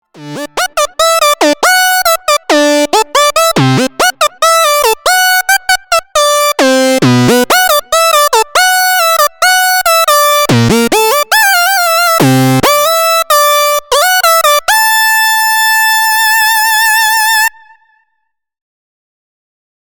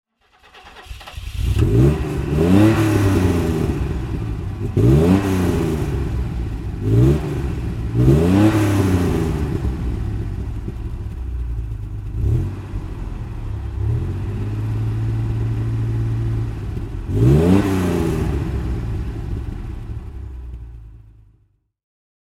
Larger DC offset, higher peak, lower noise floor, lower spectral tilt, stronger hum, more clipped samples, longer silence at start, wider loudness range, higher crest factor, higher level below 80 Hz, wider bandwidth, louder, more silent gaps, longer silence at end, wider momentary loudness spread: neither; about the same, 0 dBFS vs 0 dBFS; first, -67 dBFS vs -60 dBFS; second, -2.5 dB/octave vs -8 dB/octave; neither; neither; second, 0.15 s vs 0.55 s; second, 2 LU vs 9 LU; second, 8 dB vs 18 dB; second, -44 dBFS vs -28 dBFS; first, over 20 kHz vs 15.5 kHz; first, -8 LUFS vs -20 LUFS; neither; first, 2.45 s vs 1.25 s; second, 3 LU vs 16 LU